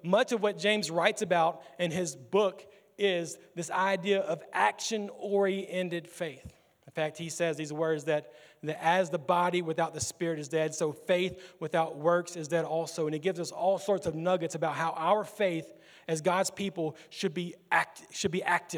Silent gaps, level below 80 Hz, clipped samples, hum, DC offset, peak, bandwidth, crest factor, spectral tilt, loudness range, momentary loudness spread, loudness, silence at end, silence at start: none; -72 dBFS; under 0.1%; none; under 0.1%; -8 dBFS; over 20 kHz; 22 dB; -4 dB/octave; 2 LU; 8 LU; -31 LUFS; 0 s; 0.05 s